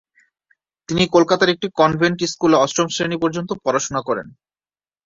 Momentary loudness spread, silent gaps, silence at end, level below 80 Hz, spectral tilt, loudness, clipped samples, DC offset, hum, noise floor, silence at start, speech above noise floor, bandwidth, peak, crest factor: 8 LU; none; 0.75 s; -54 dBFS; -4.5 dB/octave; -18 LUFS; under 0.1%; under 0.1%; none; under -90 dBFS; 0.9 s; over 72 dB; 7.8 kHz; -2 dBFS; 18 dB